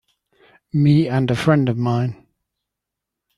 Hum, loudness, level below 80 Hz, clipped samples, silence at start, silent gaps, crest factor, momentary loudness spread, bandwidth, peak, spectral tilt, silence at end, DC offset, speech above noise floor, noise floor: none; -18 LUFS; -54 dBFS; under 0.1%; 0.75 s; none; 18 dB; 8 LU; 11.5 kHz; -2 dBFS; -8 dB/octave; 1.25 s; under 0.1%; 66 dB; -83 dBFS